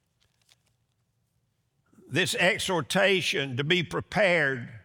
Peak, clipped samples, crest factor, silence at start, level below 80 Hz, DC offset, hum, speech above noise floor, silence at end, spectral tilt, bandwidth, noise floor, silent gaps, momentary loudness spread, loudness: -8 dBFS; under 0.1%; 20 dB; 2.1 s; -64 dBFS; under 0.1%; none; 48 dB; 0.05 s; -4 dB/octave; over 20 kHz; -74 dBFS; none; 6 LU; -25 LUFS